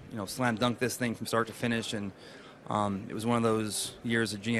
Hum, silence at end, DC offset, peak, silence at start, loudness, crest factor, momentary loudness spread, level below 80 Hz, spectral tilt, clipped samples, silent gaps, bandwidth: none; 0 s; under 0.1%; -12 dBFS; 0 s; -31 LUFS; 20 dB; 9 LU; -64 dBFS; -4.5 dB/octave; under 0.1%; none; 13 kHz